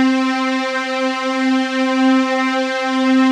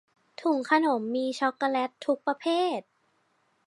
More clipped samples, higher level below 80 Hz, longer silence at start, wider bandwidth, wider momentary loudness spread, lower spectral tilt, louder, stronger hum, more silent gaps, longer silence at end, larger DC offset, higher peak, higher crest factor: neither; about the same, -90 dBFS vs -86 dBFS; second, 0 s vs 0.4 s; second, 10 kHz vs 11.5 kHz; about the same, 4 LU vs 6 LU; second, -2.5 dB/octave vs -4 dB/octave; first, -17 LUFS vs -28 LUFS; neither; neither; second, 0 s vs 0.85 s; neither; first, -4 dBFS vs -8 dBFS; second, 12 dB vs 20 dB